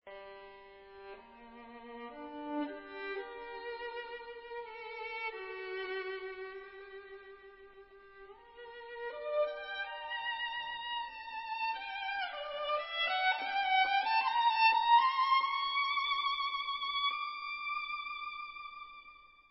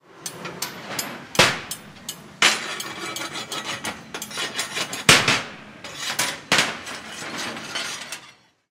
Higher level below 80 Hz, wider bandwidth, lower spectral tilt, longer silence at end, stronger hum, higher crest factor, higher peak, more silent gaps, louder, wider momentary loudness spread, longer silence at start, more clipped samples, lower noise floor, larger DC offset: second, -74 dBFS vs -58 dBFS; second, 5.6 kHz vs 17.5 kHz; second, 3.5 dB/octave vs -1.5 dB/octave; second, 0.2 s vs 0.4 s; neither; second, 20 dB vs 26 dB; second, -16 dBFS vs 0 dBFS; neither; second, -34 LUFS vs -22 LUFS; first, 23 LU vs 17 LU; about the same, 0.05 s vs 0.1 s; neither; first, -58 dBFS vs -51 dBFS; neither